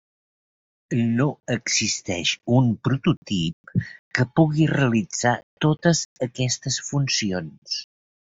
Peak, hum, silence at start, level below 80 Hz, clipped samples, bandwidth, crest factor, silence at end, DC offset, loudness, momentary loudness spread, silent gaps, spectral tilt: -4 dBFS; none; 0.9 s; -56 dBFS; under 0.1%; 8 kHz; 20 dB; 0.45 s; under 0.1%; -23 LUFS; 9 LU; 3.17-3.22 s, 3.53-3.64 s, 3.99-4.11 s, 5.43-5.57 s, 6.05-6.16 s, 7.58-7.62 s; -4.5 dB/octave